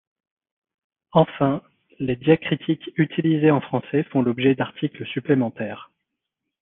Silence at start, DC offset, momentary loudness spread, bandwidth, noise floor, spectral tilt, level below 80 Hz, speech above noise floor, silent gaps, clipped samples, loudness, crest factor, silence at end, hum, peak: 1.15 s; under 0.1%; 11 LU; 4 kHz; -82 dBFS; -11 dB/octave; -60 dBFS; 61 dB; none; under 0.1%; -22 LUFS; 20 dB; 0.75 s; none; -2 dBFS